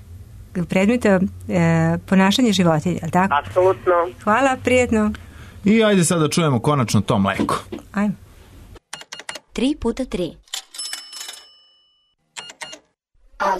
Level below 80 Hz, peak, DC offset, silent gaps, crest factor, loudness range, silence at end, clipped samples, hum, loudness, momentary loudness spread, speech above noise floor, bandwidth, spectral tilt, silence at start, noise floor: -46 dBFS; -4 dBFS; under 0.1%; none; 14 dB; 10 LU; 0 s; under 0.1%; none; -19 LUFS; 18 LU; 46 dB; 13.5 kHz; -5.5 dB/octave; 0.05 s; -64 dBFS